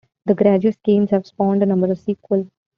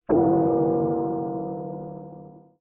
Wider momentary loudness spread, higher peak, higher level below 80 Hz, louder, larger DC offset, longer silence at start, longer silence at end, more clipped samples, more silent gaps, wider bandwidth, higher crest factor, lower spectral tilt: second, 7 LU vs 20 LU; first, -2 dBFS vs -10 dBFS; about the same, -60 dBFS vs -56 dBFS; first, -18 LUFS vs -24 LUFS; neither; first, 0.25 s vs 0.1 s; about the same, 0.3 s vs 0.2 s; neither; neither; first, 5.4 kHz vs 2.1 kHz; about the same, 16 dB vs 16 dB; about the same, -9 dB/octave vs -8 dB/octave